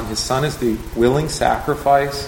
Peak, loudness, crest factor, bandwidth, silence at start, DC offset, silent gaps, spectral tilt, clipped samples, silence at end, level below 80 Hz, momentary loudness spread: -2 dBFS; -18 LUFS; 18 dB; 17 kHz; 0 s; under 0.1%; none; -5 dB/octave; under 0.1%; 0 s; -34 dBFS; 4 LU